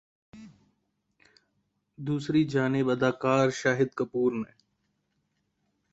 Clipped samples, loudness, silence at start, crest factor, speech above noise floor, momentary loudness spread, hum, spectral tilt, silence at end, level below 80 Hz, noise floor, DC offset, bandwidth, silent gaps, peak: under 0.1%; -27 LUFS; 0.35 s; 20 dB; 50 dB; 9 LU; none; -6.5 dB/octave; 1.5 s; -68 dBFS; -76 dBFS; under 0.1%; 8 kHz; none; -10 dBFS